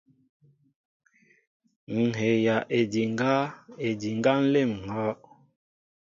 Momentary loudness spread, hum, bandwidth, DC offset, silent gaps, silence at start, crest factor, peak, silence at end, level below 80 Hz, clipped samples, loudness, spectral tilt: 10 LU; none; 7.6 kHz; under 0.1%; none; 1.9 s; 18 dB; -10 dBFS; 0.9 s; -66 dBFS; under 0.1%; -26 LUFS; -6.5 dB/octave